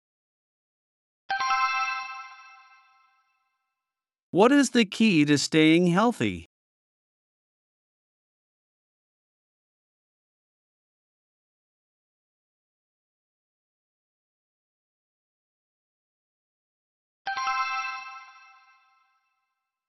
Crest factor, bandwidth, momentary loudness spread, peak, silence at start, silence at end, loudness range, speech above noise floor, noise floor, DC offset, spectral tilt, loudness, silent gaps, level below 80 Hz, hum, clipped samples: 24 dB; 12 kHz; 19 LU; -6 dBFS; 1.3 s; 1.65 s; 11 LU; 69 dB; -90 dBFS; under 0.1%; -5 dB/octave; -23 LUFS; 4.23-4.33 s, 6.46-17.25 s; -74 dBFS; none; under 0.1%